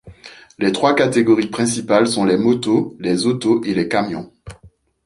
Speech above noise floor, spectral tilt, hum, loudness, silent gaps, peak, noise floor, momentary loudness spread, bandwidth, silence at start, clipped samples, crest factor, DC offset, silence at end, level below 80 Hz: 33 dB; -5 dB/octave; none; -17 LUFS; none; 0 dBFS; -49 dBFS; 6 LU; 11.5 kHz; 0.05 s; under 0.1%; 18 dB; under 0.1%; 0.4 s; -52 dBFS